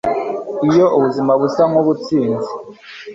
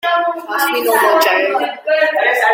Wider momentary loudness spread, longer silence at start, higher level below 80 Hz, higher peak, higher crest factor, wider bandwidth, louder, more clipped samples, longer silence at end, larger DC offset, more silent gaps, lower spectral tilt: first, 15 LU vs 6 LU; about the same, 0.05 s vs 0.05 s; first, -54 dBFS vs -70 dBFS; about the same, -2 dBFS vs -2 dBFS; about the same, 14 dB vs 12 dB; second, 7.8 kHz vs 16.5 kHz; about the same, -15 LUFS vs -14 LUFS; neither; about the same, 0 s vs 0 s; neither; neither; first, -7.5 dB/octave vs -0.5 dB/octave